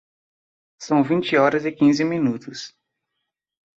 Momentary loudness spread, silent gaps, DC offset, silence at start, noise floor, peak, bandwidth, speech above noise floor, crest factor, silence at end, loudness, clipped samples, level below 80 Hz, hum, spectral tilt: 17 LU; none; under 0.1%; 0.8 s; -80 dBFS; -4 dBFS; 7.8 kHz; 60 dB; 18 dB; 1.1 s; -20 LUFS; under 0.1%; -66 dBFS; none; -6 dB/octave